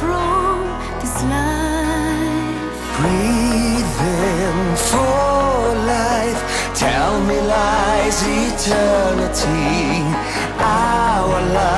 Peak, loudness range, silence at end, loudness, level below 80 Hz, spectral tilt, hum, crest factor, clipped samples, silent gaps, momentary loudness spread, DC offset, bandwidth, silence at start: -2 dBFS; 2 LU; 0 s; -17 LUFS; -28 dBFS; -4.5 dB/octave; none; 14 dB; under 0.1%; none; 5 LU; under 0.1%; 12 kHz; 0 s